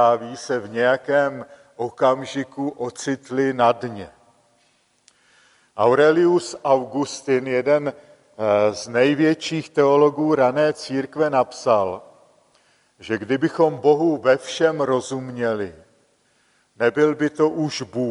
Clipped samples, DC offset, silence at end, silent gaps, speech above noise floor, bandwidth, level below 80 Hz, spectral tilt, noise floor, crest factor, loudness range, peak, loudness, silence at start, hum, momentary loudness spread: under 0.1%; under 0.1%; 0 s; none; 43 dB; 11 kHz; -66 dBFS; -5.5 dB/octave; -63 dBFS; 18 dB; 4 LU; -4 dBFS; -20 LUFS; 0 s; none; 11 LU